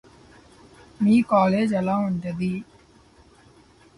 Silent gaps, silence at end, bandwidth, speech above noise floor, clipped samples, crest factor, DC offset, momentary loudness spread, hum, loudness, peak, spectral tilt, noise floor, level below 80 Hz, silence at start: none; 1.35 s; 11.5 kHz; 33 dB; under 0.1%; 16 dB; under 0.1%; 10 LU; none; -22 LUFS; -8 dBFS; -8 dB/octave; -54 dBFS; -58 dBFS; 1 s